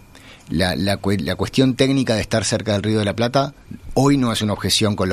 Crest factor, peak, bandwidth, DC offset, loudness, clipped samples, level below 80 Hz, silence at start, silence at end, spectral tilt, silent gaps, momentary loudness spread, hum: 18 dB; -2 dBFS; 14 kHz; under 0.1%; -19 LUFS; under 0.1%; -44 dBFS; 0.15 s; 0 s; -5 dB/octave; none; 5 LU; none